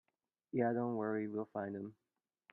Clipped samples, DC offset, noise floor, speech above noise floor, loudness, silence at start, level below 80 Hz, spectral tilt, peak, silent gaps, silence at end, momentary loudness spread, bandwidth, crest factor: under 0.1%; under 0.1%; -61 dBFS; 22 dB; -39 LUFS; 0.55 s; -86 dBFS; -11 dB/octave; -22 dBFS; none; 0.6 s; 10 LU; 3.8 kHz; 18 dB